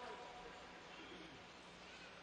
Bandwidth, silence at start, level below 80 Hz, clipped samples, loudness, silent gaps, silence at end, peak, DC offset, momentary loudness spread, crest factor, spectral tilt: 10 kHz; 0 s; -74 dBFS; under 0.1%; -55 LUFS; none; 0 s; -40 dBFS; under 0.1%; 4 LU; 16 dB; -3.5 dB/octave